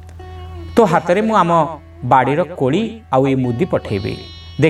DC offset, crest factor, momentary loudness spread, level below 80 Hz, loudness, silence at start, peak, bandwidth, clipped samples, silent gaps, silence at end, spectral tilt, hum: under 0.1%; 16 dB; 17 LU; -42 dBFS; -16 LUFS; 0 s; 0 dBFS; 13 kHz; under 0.1%; none; 0 s; -7 dB/octave; none